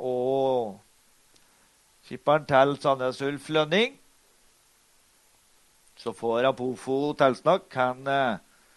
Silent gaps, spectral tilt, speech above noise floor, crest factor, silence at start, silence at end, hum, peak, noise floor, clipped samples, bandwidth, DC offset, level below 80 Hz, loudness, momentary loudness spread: none; -5.5 dB/octave; 37 dB; 22 dB; 0 s; 0.4 s; none; -6 dBFS; -62 dBFS; under 0.1%; 12 kHz; under 0.1%; -68 dBFS; -25 LUFS; 10 LU